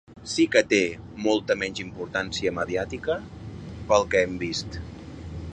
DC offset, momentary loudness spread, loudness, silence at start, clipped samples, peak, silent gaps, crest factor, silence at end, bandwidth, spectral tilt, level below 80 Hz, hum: under 0.1%; 18 LU; -25 LUFS; 0.1 s; under 0.1%; -4 dBFS; none; 22 dB; 0 s; 9.8 kHz; -4.5 dB/octave; -46 dBFS; none